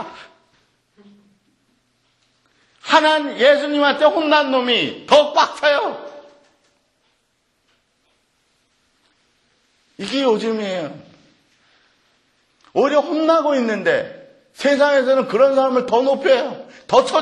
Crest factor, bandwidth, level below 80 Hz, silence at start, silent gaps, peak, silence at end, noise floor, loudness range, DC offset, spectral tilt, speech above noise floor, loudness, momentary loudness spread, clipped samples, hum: 18 dB; 10.5 kHz; -66 dBFS; 0 s; none; 0 dBFS; 0 s; -66 dBFS; 10 LU; under 0.1%; -4 dB/octave; 50 dB; -17 LUFS; 13 LU; under 0.1%; none